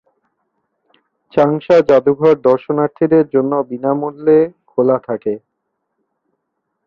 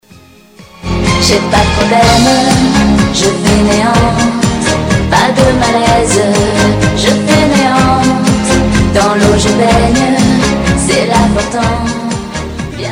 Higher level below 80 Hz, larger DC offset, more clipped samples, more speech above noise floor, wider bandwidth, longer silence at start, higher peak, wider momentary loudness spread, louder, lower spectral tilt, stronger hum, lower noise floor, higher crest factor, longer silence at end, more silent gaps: second, -58 dBFS vs -22 dBFS; second, under 0.1% vs 0.1%; neither; first, 59 dB vs 30 dB; second, 6.8 kHz vs 16.5 kHz; first, 1.35 s vs 0.6 s; about the same, 0 dBFS vs 0 dBFS; first, 9 LU vs 5 LU; second, -14 LUFS vs -9 LUFS; first, -8.5 dB/octave vs -4.5 dB/octave; neither; first, -73 dBFS vs -39 dBFS; about the same, 14 dB vs 10 dB; first, 1.5 s vs 0 s; neither